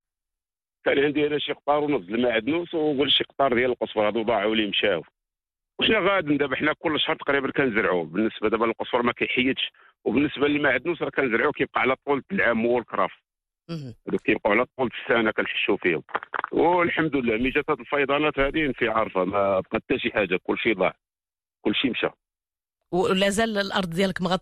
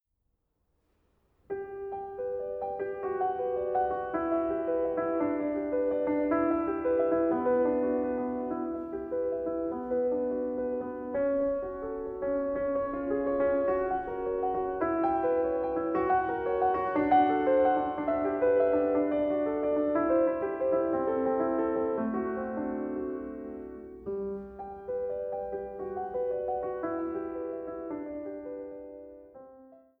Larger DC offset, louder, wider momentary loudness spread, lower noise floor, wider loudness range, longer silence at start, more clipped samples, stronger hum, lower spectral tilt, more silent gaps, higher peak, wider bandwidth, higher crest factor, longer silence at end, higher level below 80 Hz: neither; first, -24 LUFS vs -30 LUFS; second, 6 LU vs 12 LU; first, under -90 dBFS vs -78 dBFS; second, 2 LU vs 9 LU; second, 0.85 s vs 1.5 s; neither; neither; second, -5 dB/octave vs -10 dB/octave; neither; about the same, -10 dBFS vs -12 dBFS; first, 13 kHz vs 4 kHz; about the same, 14 dB vs 18 dB; second, 0 s vs 0.25 s; first, -52 dBFS vs -58 dBFS